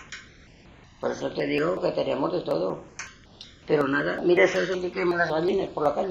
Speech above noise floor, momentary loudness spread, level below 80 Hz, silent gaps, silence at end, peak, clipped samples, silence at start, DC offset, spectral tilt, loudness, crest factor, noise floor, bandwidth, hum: 27 dB; 20 LU; -56 dBFS; none; 0 s; -8 dBFS; under 0.1%; 0 s; under 0.1%; -5.5 dB/octave; -25 LUFS; 18 dB; -51 dBFS; 8 kHz; none